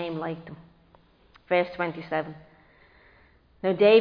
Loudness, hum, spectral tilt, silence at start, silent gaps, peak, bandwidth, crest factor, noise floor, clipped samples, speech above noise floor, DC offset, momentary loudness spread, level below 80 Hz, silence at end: -27 LUFS; none; -8.5 dB/octave; 0 s; none; -6 dBFS; 5.2 kHz; 20 dB; -59 dBFS; under 0.1%; 35 dB; under 0.1%; 23 LU; -64 dBFS; 0 s